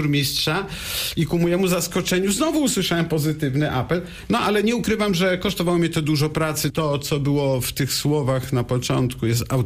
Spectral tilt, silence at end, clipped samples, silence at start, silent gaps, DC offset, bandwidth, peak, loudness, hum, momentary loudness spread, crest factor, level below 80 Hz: -5 dB/octave; 0 s; under 0.1%; 0 s; none; under 0.1%; 15.5 kHz; -8 dBFS; -21 LUFS; none; 3 LU; 12 dB; -44 dBFS